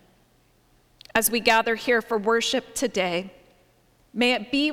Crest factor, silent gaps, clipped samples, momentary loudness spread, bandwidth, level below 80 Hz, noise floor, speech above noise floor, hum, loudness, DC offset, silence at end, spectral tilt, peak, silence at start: 20 dB; none; under 0.1%; 7 LU; 18.5 kHz; -58 dBFS; -61 dBFS; 38 dB; none; -23 LUFS; under 0.1%; 0 s; -2.5 dB/octave; -4 dBFS; 1.15 s